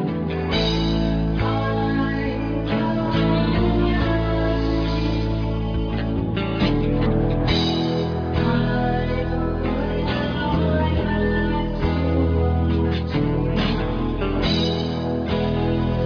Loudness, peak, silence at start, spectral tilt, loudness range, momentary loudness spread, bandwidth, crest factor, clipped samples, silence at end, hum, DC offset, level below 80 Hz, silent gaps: -22 LUFS; -6 dBFS; 0 s; -8 dB/octave; 1 LU; 4 LU; 5.4 kHz; 14 dB; under 0.1%; 0 s; none; under 0.1%; -28 dBFS; none